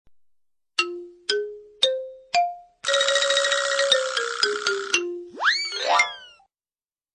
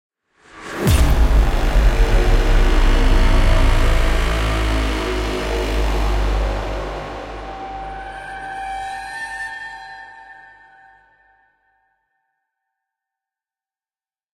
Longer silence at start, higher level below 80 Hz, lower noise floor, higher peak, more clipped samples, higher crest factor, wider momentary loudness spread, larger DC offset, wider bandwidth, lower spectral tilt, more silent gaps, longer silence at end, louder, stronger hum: first, 0.8 s vs 0.55 s; second, -70 dBFS vs -20 dBFS; about the same, under -90 dBFS vs under -90 dBFS; second, -6 dBFS vs -2 dBFS; neither; about the same, 20 dB vs 16 dB; second, 10 LU vs 14 LU; neither; second, 11 kHz vs 16 kHz; second, 1 dB/octave vs -5.5 dB/octave; neither; second, 0.85 s vs 4.05 s; second, -23 LUFS vs -20 LUFS; neither